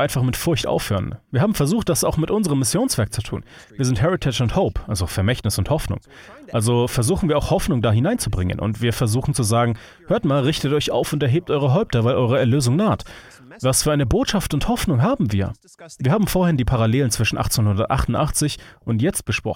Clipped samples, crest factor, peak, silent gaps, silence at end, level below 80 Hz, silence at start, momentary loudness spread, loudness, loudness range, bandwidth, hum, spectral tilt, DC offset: under 0.1%; 16 dB; -4 dBFS; none; 0 s; -36 dBFS; 0 s; 6 LU; -20 LUFS; 2 LU; 17 kHz; none; -5.5 dB/octave; under 0.1%